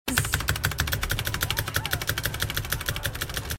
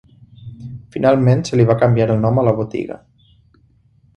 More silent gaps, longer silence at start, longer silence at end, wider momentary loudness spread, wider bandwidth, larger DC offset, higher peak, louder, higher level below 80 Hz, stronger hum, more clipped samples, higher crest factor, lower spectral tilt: neither; second, 0.05 s vs 0.4 s; second, 0 s vs 1.2 s; second, 4 LU vs 20 LU; first, 17 kHz vs 8.8 kHz; neither; second, -4 dBFS vs 0 dBFS; second, -27 LUFS vs -16 LUFS; first, -36 dBFS vs -46 dBFS; neither; neither; first, 24 dB vs 16 dB; second, -3 dB/octave vs -8 dB/octave